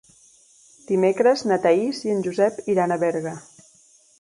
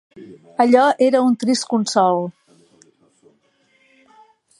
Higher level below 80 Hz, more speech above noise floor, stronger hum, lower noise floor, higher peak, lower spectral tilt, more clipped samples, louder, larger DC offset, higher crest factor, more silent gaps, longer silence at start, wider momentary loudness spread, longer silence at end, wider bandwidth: first, -68 dBFS vs -74 dBFS; second, 35 dB vs 44 dB; neither; second, -56 dBFS vs -61 dBFS; second, -6 dBFS vs -2 dBFS; first, -6 dB/octave vs -4.5 dB/octave; neither; second, -21 LUFS vs -17 LUFS; neither; about the same, 16 dB vs 18 dB; neither; first, 0.9 s vs 0.15 s; about the same, 8 LU vs 10 LU; second, 0.8 s vs 2.3 s; about the same, 11.5 kHz vs 11.5 kHz